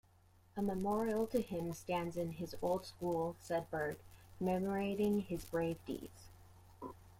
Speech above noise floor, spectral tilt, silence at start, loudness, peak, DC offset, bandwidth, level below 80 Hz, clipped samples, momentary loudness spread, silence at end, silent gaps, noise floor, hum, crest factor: 29 dB; -6.5 dB/octave; 0.55 s; -39 LUFS; -24 dBFS; under 0.1%; 16.5 kHz; -64 dBFS; under 0.1%; 14 LU; 0.05 s; none; -67 dBFS; none; 16 dB